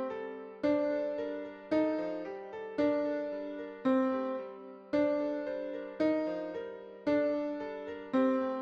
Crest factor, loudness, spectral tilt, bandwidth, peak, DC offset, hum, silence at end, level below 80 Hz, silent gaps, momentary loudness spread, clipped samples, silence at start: 16 dB; -34 LUFS; -7 dB/octave; 6.6 kHz; -18 dBFS; under 0.1%; none; 0 s; -72 dBFS; none; 12 LU; under 0.1%; 0 s